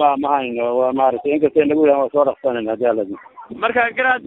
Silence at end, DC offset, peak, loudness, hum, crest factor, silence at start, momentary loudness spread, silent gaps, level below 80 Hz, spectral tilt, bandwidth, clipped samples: 0 s; under 0.1%; -2 dBFS; -17 LUFS; none; 16 dB; 0 s; 8 LU; none; -60 dBFS; -7.5 dB/octave; 4 kHz; under 0.1%